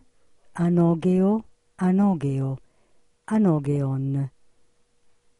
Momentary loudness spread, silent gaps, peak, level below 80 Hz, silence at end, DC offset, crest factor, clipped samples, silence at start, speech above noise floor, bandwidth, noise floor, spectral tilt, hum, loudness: 10 LU; none; -10 dBFS; -58 dBFS; 1.1 s; under 0.1%; 14 dB; under 0.1%; 0.55 s; 42 dB; 11 kHz; -63 dBFS; -9.5 dB/octave; none; -23 LUFS